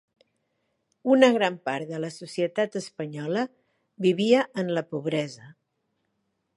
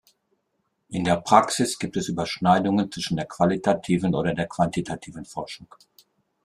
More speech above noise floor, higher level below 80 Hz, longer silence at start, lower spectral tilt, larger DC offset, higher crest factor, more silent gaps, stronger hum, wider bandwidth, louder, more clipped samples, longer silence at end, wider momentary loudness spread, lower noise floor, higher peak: about the same, 52 dB vs 51 dB; second, -78 dBFS vs -56 dBFS; first, 1.05 s vs 0.9 s; about the same, -5.5 dB/octave vs -5.5 dB/octave; neither; about the same, 22 dB vs 24 dB; neither; neither; second, 11.5 kHz vs 13 kHz; about the same, -25 LUFS vs -23 LUFS; neither; first, 1.05 s vs 0.8 s; about the same, 14 LU vs 16 LU; about the same, -76 dBFS vs -74 dBFS; about the same, -4 dBFS vs -2 dBFS